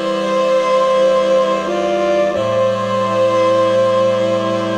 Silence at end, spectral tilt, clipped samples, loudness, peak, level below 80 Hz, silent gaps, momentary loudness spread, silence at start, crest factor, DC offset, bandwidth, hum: 0 s; -5.5 dB/octave; under 0.1%; -15 LUFS; -4 dBFS; -56 dBFS; none; 4 LU; 0 s; 10 dB; under 0.1%; 9.8 kHz; none